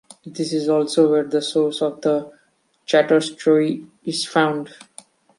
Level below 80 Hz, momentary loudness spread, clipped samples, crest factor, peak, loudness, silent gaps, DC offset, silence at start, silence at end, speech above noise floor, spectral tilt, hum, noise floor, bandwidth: -72 dBFS; 12 LU; under 0.1%; 18 dB; -2 dBFS; -20 LUFS; none; under 0.1%; 0.25 s; 0.7 s; 44 dB; -5 dB/octave; none; -63 dBFS; 11.5 kHz